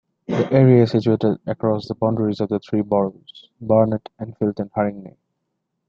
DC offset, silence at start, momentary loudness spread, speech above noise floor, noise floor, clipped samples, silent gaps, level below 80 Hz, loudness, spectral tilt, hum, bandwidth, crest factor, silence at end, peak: under 0.1%; 0.3 s; 12 LU; 56 dB; -76 dBFS; under 0.1%; none; -58 dBFS; -20 LUFS; -9.5 dB/octave; none; 7 kHz; 18 dB; 0.8 s; -2 dBFS